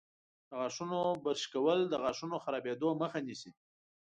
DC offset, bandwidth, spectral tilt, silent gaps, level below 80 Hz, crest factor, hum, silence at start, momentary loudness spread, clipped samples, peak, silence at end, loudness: under 0.1%; 9.4 kHz; -5 dB/octave; none; -78 dBFS; 18 dB; none; 0.5 s; 13 LU; under 0.1%; -20 dBFS; 0.65 s; -35 LUFS